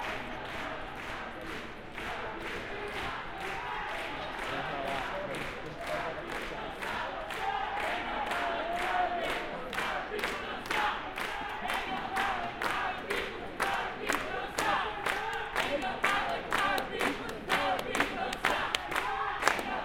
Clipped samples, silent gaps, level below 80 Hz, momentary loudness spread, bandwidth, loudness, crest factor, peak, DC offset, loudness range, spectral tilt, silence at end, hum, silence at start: under 0.1%; none; -52 dBFS; 8 LU; 17 kHz; -33 LUFS; 30 dB; -4 dBFS; under 0.1%; 6 LU; -3 dB/octave; 0 s; none; 0 s